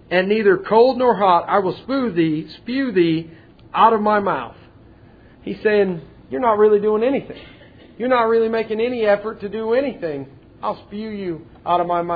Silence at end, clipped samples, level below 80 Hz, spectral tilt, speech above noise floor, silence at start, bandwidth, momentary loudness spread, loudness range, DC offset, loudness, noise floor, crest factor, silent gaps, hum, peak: 0 s; under 0.1%; -54 dBFS; -9 dB/octave; 28 dB; 0.1 s; 5 kHz; 15 LU; 3 LU; under 0.1%; -19 LUFS; -46 dBFS; 18 dB; none; none; -2 dBFS